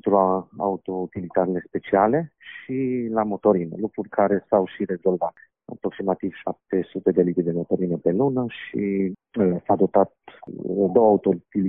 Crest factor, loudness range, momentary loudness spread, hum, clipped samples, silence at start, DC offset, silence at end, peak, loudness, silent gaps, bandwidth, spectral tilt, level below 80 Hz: 18 dB; 3 LU; 10 LU; none; under 0.1%; 0.05 s; under 0.1%; 0 s; -4 dBFS; -23 LUFS; none; 3.8 kHz; -7.5 dB/octave; -62 dBFS